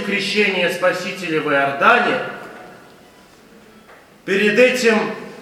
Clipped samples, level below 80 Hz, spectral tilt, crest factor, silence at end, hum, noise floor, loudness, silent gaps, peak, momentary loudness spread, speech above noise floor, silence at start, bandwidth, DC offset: under 0.1%; -66 dBFS; -4 dB/octave; 18 dB; 0 s; none; -46 dBFS; -16 LUFS; none; 0 dBFS; 14 LU; 30 dB; 0 s; 16 kHz; under 0.1%